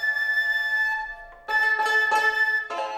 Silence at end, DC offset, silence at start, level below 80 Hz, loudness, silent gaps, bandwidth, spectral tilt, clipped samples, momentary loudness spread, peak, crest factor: 0 s; under 0.1%; 0 s; -56 dBFS; -22 LUFS; none; 16.5 kHz; 0 dB/octave; under 0.1%; 8 LU; -12 dBFS; 12 dB